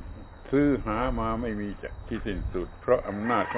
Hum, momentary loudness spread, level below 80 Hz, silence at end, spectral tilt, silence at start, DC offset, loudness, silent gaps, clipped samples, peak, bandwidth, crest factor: none; 11 LU; -40 dBFS; 0 s; -6 dB/octave; 0 s; under 0.1%; -29 LUFS; none; under 0.1%; -10 dBFS; 4 kHz; 20 dB